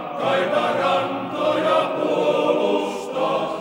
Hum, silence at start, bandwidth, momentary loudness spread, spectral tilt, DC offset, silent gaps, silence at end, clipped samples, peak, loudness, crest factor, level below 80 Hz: none; 0 s; 16.5 kHz; 4 LU; -5 dB/octave; under 0.1%; none; 0 s; under 0.1%; -6 dBFS; -21 LUFS; 14 dB; -66 dBFS